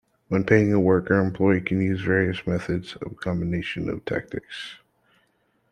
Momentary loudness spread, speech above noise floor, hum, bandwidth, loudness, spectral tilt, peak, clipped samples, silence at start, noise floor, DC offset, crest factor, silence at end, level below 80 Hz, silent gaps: 15 LU; 45 dB; none; 10 kHz; -23 LUFS; -8 dB/octave; -4 dBFS; under 0.1%; 0.3 s; -68 dBFS; under 0.1%; 22 dB; 0.95 s; -54 dBFS; none